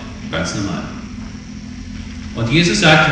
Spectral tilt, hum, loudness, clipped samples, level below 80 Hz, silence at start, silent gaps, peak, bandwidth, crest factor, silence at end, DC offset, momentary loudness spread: -4.5 dB/octave; none; -16 LUFS; under 0.1%; -36 dBFS; 0 s; none; 0 dBFS; 10 kHz; 18 dB; 0 s; under 0.1%; 20 LU